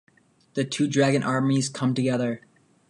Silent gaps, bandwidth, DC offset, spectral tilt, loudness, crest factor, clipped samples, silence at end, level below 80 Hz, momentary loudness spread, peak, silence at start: none; 11.5 kHz; under 0.1%; -5.5 dB/octave; -24 LUFS; 16 dB; under 0.1%; 0.55 s; -68 dBFS; 9 LU; -8 dBFS; 0.55 s